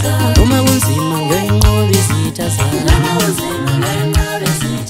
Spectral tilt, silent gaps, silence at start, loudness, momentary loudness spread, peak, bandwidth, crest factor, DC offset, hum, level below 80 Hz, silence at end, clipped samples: -5 dB/octave; none; 0 s; -13 LUFS; 5 LU; 0 dBFS; 16.5 kHz; 12 dB; under 0.1%; none; -20 dBFS; 0 s; under 0.1%